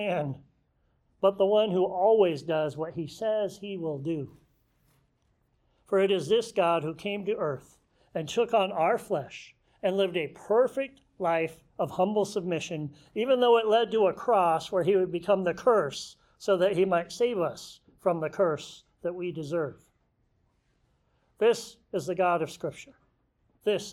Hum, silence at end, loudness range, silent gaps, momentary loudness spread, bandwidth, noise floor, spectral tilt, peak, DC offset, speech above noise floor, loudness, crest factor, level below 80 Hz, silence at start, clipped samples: none; 0 s; 7 LU; none; 13 LU; 14 kHz; -71 dBFS; -5.5 dB/octave; -10 dBFS; under 0.1%; 44 dB; -28 LUFS; 18 dB; -68 dBFS; 0 s; under 0.1%